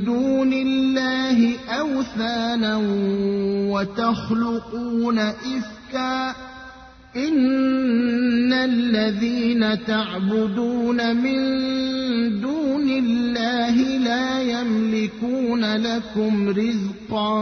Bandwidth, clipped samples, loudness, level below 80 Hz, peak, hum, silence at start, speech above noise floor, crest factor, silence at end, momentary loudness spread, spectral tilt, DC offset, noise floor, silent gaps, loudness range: 6.6 kHz; under 0.1%; -21 LUFS; -54 dBFS; -8 dBFS; none; 0 s; 22 dB; 14 dB; 0 s; 6 LU; -6 dB/octave; under 0.1%; -43 dBFS; none; 3 LU